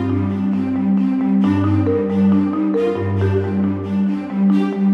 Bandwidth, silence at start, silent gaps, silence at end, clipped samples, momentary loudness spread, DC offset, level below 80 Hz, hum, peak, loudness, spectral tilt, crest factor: 5.4 kHz; 0 s; none; 0 s; under 0.1%; 4 LU; under 0.1%; -58 dBFS; none; -6 dBFS; -18 LUFS; -10 dB/octave; 10 dB